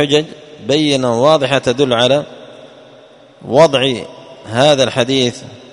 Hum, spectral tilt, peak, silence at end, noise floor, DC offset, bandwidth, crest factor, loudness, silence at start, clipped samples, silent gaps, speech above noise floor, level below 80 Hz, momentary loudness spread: none; -4.5 dB/octave; 0 dBFS; 0.15 s; -42 dBFS; under 0.1%; 11 kHz; 14 dB; -13 LUFS; 0 s; under 0.1%; none; 29 dB; -52 dBFS; 19 LU